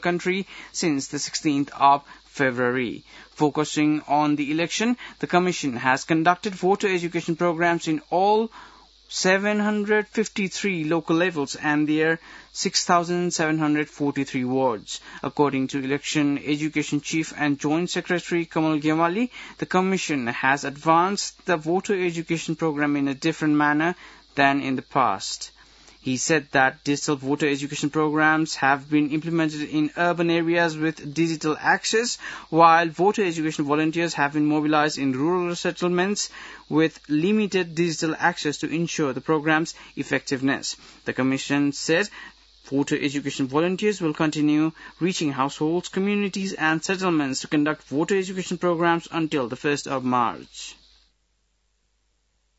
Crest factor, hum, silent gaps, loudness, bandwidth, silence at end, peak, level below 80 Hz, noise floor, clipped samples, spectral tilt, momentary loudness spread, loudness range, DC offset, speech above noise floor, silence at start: 20 dB; none; none; -23 LUFS; 8 kHz; 1.85 s; -4 dBFS; -62 dBFS; -69 dBFS; under 0.1%; -4.5 dB/octave; 7 LU; 3 LU; under 0.1%; 46 dB; 0 s